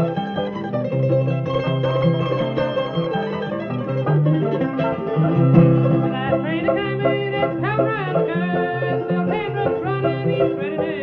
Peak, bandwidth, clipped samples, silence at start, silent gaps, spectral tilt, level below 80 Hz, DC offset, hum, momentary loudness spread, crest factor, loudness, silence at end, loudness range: -2 dBFS; 5.6 kHz; under 0.1%; 0 s; none; -10 dB/octave; -50 dBFS; under 0.1%; none; 6 LU; 18 dB; -20 LUFS; 0 s; 3 LU